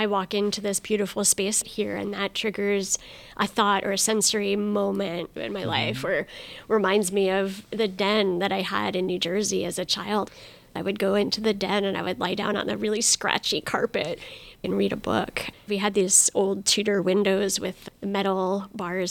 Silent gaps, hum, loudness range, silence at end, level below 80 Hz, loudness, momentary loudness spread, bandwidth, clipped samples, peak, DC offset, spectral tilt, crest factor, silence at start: none; none; 3 LU; 0 s; -58 dBFS; -24 LUFS; 9 LU; 19 kHz; under 0.1%; -4 dBFS; under 0.1%; -3 dB/octave; 20 dB; 0 s